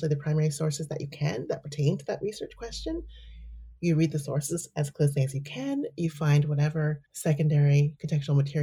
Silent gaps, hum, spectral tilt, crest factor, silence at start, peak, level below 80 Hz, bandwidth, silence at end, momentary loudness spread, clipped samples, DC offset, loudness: none; none; -6.5 dB/octave; 14 dB; 0 s; -14 dBFS; -52 dBFS; 14.5 kHz; 0 s; 12 LU; under 0.1%; under 0.1%; -28 LUFS